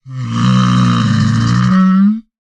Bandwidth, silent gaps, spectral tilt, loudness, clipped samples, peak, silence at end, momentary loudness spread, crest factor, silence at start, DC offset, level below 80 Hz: 8.8 kHz; none; -6.5 dB/octave; -12 LUFS; under 0.1%; -2 dBFS; 0.25 s; 4 LU; 10 dB; 0.05 s; under 0.1%; -38 dBFS